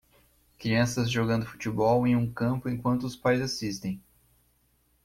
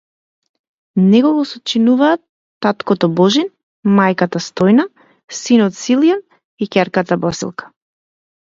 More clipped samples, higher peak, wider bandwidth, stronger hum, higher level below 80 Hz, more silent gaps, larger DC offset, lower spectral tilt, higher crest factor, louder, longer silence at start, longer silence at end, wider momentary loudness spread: neither; second, -12 dBFS vs 0 dBFS; first, 16 kHz vs 7.8 kHz; first, 60 Hz at -45 dBFS vs none; about the same, -56 dBFS vs -58 dBFS; second, none vs 2.29-2.61 s, 3.63-3.83 s, 5.24-5.28 s, 6.45-6.58 s; neither; about the same, -6 dB/octave vs -5.5 dB/octave; about the same, 16 dB vs 16 dB; second, -28 LUFS vs -15 LUFS; second, 0.6 s vs 0.95 s; first, 1.05 s vs 0.85 s; second, 10 LU vs 13 LU